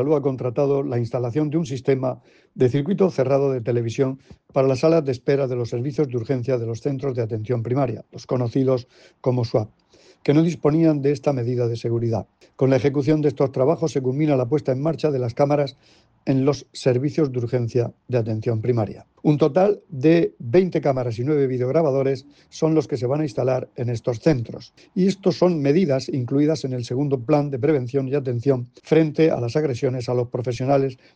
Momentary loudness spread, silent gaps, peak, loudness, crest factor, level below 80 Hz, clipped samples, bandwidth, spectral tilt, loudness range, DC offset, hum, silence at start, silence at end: 7 LU; none; -4 dBFS; -22 LUFS; 18 dB; -58 dBFS; under 0.1%; 8.8 kHz; -8 dB/octave; 3 LU; under 0.1%; none; 0 s; 0.2 s